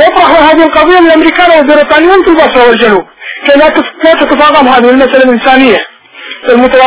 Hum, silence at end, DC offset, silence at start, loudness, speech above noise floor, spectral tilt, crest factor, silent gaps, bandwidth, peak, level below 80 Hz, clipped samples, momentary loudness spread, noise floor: none; 0 s; under 0.1%; 0 s; -4 LUFS; 22 dB; -7.5 dB/octave; 4 dB; none; 4 kHz; 0 dBFS; -36 dBFS; 20%; 7 LU; -26 dBFS